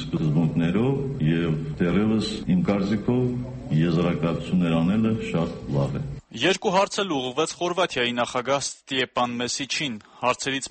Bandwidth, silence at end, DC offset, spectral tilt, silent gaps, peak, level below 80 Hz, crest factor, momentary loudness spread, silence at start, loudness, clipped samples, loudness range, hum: 8.8 kHz; 0 s; under 0.1%; -5.5 dB/octave; none; -8 dBFS; -48 dBFS; 16 dB; 5 LU; 0 s; -24 LUFS; under 0.1%; 2 LU; none